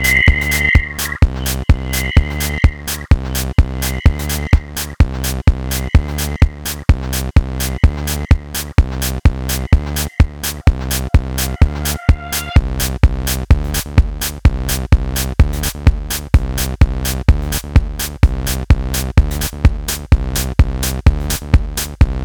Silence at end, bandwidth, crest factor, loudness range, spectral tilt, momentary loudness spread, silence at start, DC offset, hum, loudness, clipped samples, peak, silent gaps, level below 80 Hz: 0 s; over 20 kHz; 14 dB; 1 LU; -4.5 dB/octave; 5 LU; 0 s; under 0.1%; none; -16 LUFS; under 0.1%; 0 dBFS; none; -16 dBFS